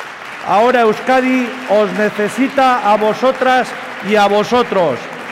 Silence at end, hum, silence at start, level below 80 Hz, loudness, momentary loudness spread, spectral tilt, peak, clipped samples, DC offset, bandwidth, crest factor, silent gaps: 0 s; none; 0 s; -54 dBFS; -14 LUFS; 6 LU; -5 dB/octave; -4 dBFS; under 0.1%; under 0.1%; 16 kHz; 10 dB; none